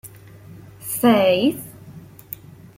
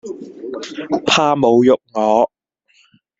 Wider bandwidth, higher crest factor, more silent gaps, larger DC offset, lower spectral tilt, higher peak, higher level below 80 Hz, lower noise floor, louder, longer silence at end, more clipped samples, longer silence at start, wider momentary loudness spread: first, 16.5 kHz vs 8 kHz; about the same, 18 dB vs 16 dB; neither; neither; about the same, -4.5 dB/octave vs -4.5 dB/octave; second, -4 dBFS vs 0 dBFS; about the same, -58 dBFS vs -58 dBFS; second, -42 dBFS vs -57 dBFS; second, -18 LUFS vs -15 LUFS; second, 0.75 s vs 0.95 s; neither; about the same, 0.05 s vs 0.05 s; first, 26 LU vs 17 LU